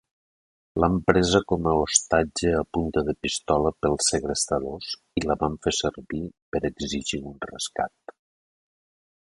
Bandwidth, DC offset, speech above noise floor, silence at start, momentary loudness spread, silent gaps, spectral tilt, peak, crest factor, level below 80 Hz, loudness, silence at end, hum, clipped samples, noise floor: 11.5 kHz; under 0.1%; over 65 dB; 0.75 s; 12 LU; 6.42-6.52 s; -4 dB/octave; 0 dBFS; 26 dB; -44 dBFS; -25 LUFS; 1.4 s; none; under 0.1%; under -90 dBFS